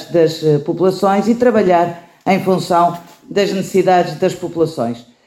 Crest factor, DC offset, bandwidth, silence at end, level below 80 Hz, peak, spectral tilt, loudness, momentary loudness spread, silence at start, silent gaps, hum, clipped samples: 14 dB; under 0.1%; 16 kHz; 0.25 s; -56 dBFS; -2 dBFS; -6.5 dB/octave; -15 LUFS; 8 LU; 0 s; none; none; under 0.1%